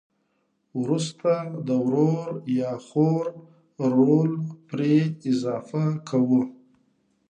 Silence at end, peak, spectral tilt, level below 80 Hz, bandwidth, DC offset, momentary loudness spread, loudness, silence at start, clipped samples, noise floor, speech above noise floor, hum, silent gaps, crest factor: 0.75 s; -8 dBFS; -8 dB/octave; -74 dBFS; 9.4 kHz; under 0.1%; 9 LU; -24 LUFS; 0.75 s; under 0.1%; -72 dBFS; 48 dB; none; none; 16 dB